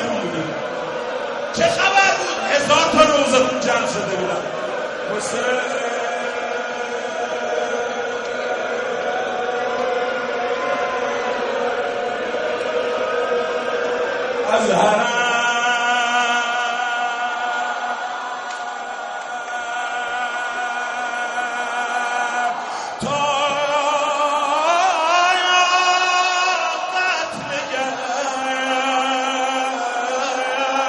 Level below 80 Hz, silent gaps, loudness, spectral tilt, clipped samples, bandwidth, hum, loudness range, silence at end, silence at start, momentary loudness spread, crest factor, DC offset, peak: -60 dBFS; none; -20 LUFS; -2 dB/octave; under 0.1%; 11 kHz; none; 7 LU; 0 s; 0 s; 10 LU; 20 dB; under 0.1%; 0 dBFS